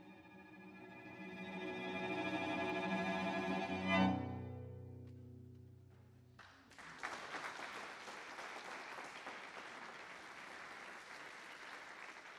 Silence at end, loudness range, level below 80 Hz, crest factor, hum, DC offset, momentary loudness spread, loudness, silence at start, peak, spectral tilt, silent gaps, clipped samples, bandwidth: 0 s; 11 LU; -80 dBFS; 22 dB; none; under 0.1%; 19 LU; -44 LUFS; 0 s; -22 dBFS; -5.5 dB/octave; none; under 0.1%; 13 kHz